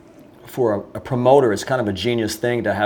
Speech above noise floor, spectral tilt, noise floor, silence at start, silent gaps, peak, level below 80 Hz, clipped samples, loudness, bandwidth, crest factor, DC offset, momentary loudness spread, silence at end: 25 dB; -5.5 dB/octave; -44 dBFS; 0.45 s; none; -2 dBFS; -54 dBFS; under 0.1%; -19 LUFS; over 20 kHz; 18 dB; under 0.1%; 11 LU; 0 s